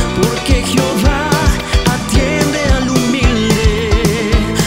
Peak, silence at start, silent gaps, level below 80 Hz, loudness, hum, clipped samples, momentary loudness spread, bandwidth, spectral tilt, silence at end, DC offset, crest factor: 0 dBFS; 0 s; none; -18 dBFS; -13 LUFS; none; under 0.1%; 2 LU; 16.5 kHz; -5 dB/octave; 0 s; 0.6%; 12 dB